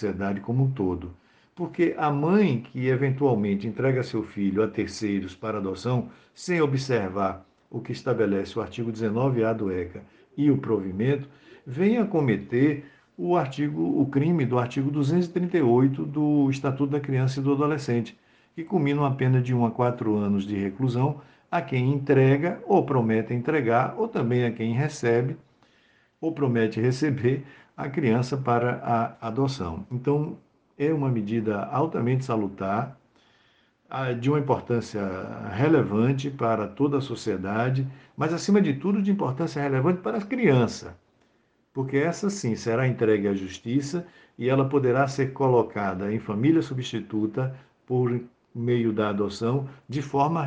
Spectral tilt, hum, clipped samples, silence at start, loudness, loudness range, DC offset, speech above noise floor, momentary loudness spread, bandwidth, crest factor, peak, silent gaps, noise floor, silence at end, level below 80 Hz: -7.5 dB/octave; none; under 0.1%; 0 s; -25 LUFS; 4 LU; under 0.1%; 42 dB; 10 LU; 9 kHz; 18 dB; -8 dBFS; none; -67 dBFS; 0 s; -62 dBFS